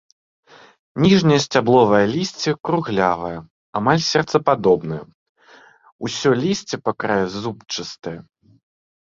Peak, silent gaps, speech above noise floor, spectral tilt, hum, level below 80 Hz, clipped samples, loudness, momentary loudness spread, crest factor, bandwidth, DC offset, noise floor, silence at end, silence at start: -2 dBFS; 3.50-3.73 s, 5.14-5.35 s, 5.92-5.99 s; 31 dB; -5.5 dB/octave; none; -54 dBFS; under 0.1%; -19 LUFS; 16 LU; 18 dB; 7.6 kHz; under 0.1%; -49 dBFS; 0.95 s; 0.95 s